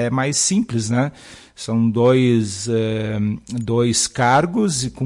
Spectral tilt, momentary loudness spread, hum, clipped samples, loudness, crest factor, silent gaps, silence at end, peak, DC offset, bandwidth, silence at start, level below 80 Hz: -4.5 dB/octave; 8 LU; none; under 0.1%; -18 LUFS; 14 dB; none; 0 s; -6 dBFS; under 0.1%; 11.5 kHz; 0 s; -50 dBFS